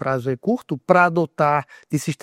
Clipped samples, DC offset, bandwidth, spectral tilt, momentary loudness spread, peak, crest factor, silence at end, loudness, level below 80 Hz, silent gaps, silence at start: under 0.1%; under 0.1%; 16 kHz; -6.5 dB/octave; 9 LU; 0 dBFS; 20 dB; 0.1 s; -20 LUFS; -62 dBFS; none; 0 s